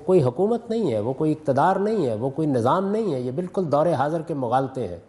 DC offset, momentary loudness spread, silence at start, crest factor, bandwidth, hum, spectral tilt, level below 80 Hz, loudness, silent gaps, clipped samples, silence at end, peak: under 0.1%; 6 LU; 0 s; 14 dB; 11.5 kHz; none; -8 dB/octave; -62 dBFS; -23 LUFS; none; under 0.1%; 0.1 s; -8 dBFS